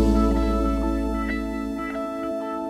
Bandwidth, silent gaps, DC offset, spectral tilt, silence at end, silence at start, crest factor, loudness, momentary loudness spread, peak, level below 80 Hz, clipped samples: 13.5 kHz; none; under 0.1%; -7.5 dB/octave; 0 s; 0 s; 16 dB; -25 LUFS; 8 LU; -8 dBFS; -28 dBFS; under 0.1%